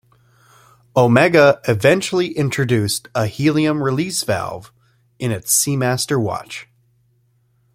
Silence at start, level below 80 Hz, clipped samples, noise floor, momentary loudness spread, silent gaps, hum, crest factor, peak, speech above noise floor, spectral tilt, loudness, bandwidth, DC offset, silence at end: 0.95 s; -54 dBFS; under 0.1%; -60 dBFS; 13 LU; none; none; 18 dB; 0 dBFS; 44 dB; -4.5 dB/octave; -17 LUFS; 16.5 kHz; under 0.1%; 1.1 s